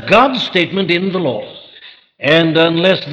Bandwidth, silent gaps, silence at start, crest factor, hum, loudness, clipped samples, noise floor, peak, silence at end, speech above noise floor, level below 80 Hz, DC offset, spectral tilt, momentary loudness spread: 8.8 kHz; none; 0 s; 14 dB; none; -13 LUFS; under 0.1%; -41 dBFS; -2 dBFS; 0 s; 28 dB; -54 dBFS; under 0.1%; -6 dB/octave; 13 LU